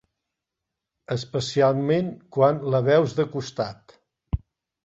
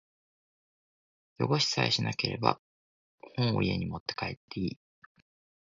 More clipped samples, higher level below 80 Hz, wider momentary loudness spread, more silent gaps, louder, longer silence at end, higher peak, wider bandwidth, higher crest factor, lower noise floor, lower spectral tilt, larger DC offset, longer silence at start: neither; first, -44 dBFS vs -56 dBFS; about the same, 13 LU vs 11 LU; second, none vs 2.59-3.18 s, 4.00-4.06 s, 4.37-4.48 s; first, -24 LUFS vs -30 LUFS; second, 0.45 s vs 0.85 s; about the same, -6 dBFS vs -6 dBFS; about the same, 8 kHz vs 7.6 kHz; second, 18 dB vs 28 dB; second, -85 dBFS vs under -90 dBFS; first, -6.5 dB/octave vs -5 dB/octave; neither; second, 1.1 s vs 1.4 s